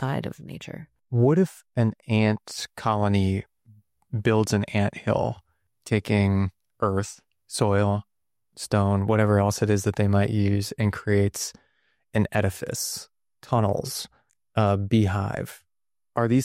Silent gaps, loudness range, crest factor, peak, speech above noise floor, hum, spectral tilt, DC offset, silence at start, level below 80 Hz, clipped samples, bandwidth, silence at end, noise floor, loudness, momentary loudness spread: none; 3 LU; 16 dB; -10 dBFS; over 67 dB; none; -6 dB/octave; under 0.1%; 0 s; -56 dBFS; under 0.1%; 15.5 kHz; 0 s; under -90 dBFS; -25 LUFS; 12 LU